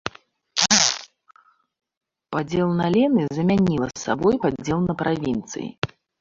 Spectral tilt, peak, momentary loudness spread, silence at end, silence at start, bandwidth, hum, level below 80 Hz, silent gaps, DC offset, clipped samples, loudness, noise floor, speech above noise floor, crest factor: -4 dB/octave; 0 dBFS; 14 LU; 0.35 s; 0.05 s; 8 kHz; none; -50 dBFS; 1.97-2.01 s, 5.78-5.82 s; under 0.1%; under 0.1%; -21 LUFS; -44 dBFS; 23 dB; 22 dB